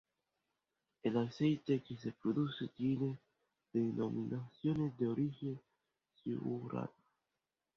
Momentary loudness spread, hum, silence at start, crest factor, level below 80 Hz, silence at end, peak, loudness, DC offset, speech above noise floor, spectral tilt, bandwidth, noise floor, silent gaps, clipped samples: 9 LU; none; 1.05 s; 18 dB; -74 dBFS; 0.85 s; -22 dBFS; -39 LUFS; under 0.1%; 52 dB; -7.5 dB/octave; 6.8 kHz; -90 dBFS; none; under 0.1%